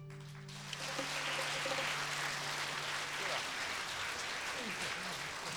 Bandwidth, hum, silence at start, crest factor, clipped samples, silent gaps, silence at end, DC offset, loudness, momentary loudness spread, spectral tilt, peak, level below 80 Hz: over 20 kHz; none; 0 s; 16 dB; under 0.1%; none; 0 s; under 0.1%; -38 LUFS; 6 LU; -1.5 dB/octave; -24 dBFS; -70 dBFS